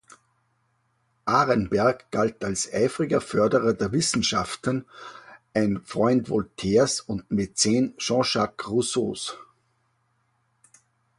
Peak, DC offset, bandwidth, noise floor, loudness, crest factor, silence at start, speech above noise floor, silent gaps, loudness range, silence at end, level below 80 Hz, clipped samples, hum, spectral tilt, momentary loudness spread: -6 dBFS; under 0.1%; 11.5 kHz; -70 dBFS; -24 LUFS; 20 dB; 1.25 s; 46 dB; none; 2 LU; 1.75 s; -54 dBFS; under 0.1%; none; -4.5 dB/octave; 8 LU